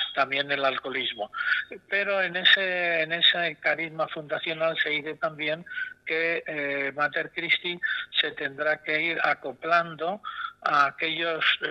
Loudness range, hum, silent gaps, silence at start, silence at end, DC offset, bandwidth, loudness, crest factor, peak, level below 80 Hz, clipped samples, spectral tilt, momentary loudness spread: 4 LU; none; none; 0 s; 0 s; under 0.1%; 8.8 kHz; -25 LUFS; 22 dB; -6 dBFS; -72 dBFS; under 0.1%; -4.5 dB/octave; 10 LU